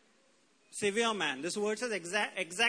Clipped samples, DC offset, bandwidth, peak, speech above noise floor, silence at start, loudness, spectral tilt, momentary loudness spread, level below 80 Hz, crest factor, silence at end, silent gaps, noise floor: under 0.1%; under 0.1%; 11 kHz; -16 dBFS; 36 dB; 0.7 s; -33 LUFS; -2 dB/octave; 5 LU; -80 dBFS; 18 dB; 0 s; none; -69 dBFS